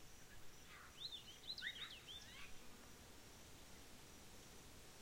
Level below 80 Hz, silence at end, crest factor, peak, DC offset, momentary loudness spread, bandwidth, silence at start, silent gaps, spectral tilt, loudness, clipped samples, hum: -70 dBFS; 0 s; 22 dB; -34 dBFS; under 0.1%; 12 LU; 16.5 kHz; 0 s; none; -1.5 dB/octave; -55 LUFS; under 0.1%; none